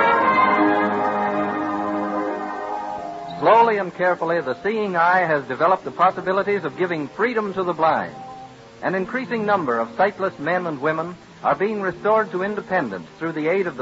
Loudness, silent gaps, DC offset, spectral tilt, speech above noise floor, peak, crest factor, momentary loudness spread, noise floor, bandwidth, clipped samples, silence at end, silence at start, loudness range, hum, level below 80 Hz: -21 LUFS; none; under 0.1%; -7 dB/octave; 19 dB; -4 dBFS; 18 dB; 12 LU; -40 dBFS; 8 kHz; under 0.1%; 0 s; 0 s; 4 LU; none; -60 dBFS